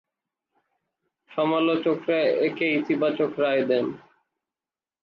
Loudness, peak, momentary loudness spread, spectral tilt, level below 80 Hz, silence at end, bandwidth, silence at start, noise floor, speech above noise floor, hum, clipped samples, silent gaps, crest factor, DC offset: -24 LUFS; -10 dBFS; 6 LU; -8 dB/octave; -78 dBFS; 1.05 s; 5.8 kHz; 1.3 s; under -90 dBFS; over 67 dB; none; under 0.1%; none; 14 dB; under 0.1%